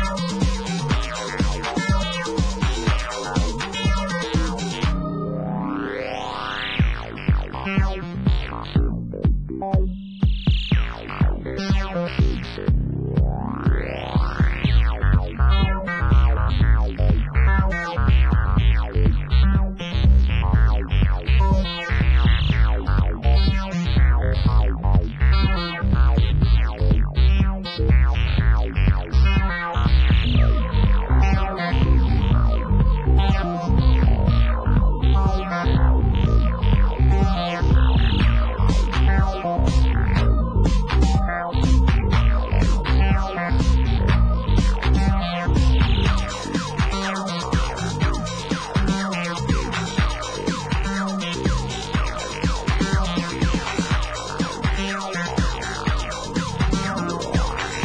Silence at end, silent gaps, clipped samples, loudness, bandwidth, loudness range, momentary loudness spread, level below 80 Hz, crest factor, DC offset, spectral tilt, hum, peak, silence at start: 0 s; none; under 0.1%; -21 LUFS; 9.8 kHz; 4 LU; 6 LU; -20 dBFS; 14 dB; under 0.1%; -6 dB/octave; none; -6 dBFS; 0 s